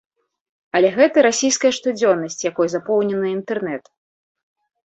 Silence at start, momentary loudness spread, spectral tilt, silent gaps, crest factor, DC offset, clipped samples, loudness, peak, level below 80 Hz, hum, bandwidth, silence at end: 0.75 s; 10 LU; -3.5 dB/octave; none; 18 dB; under 0.1%; under 0.1%; -18 LUFS; -2 dBFS; -66 dBFS; none; 8.4 kHz; 1.05 s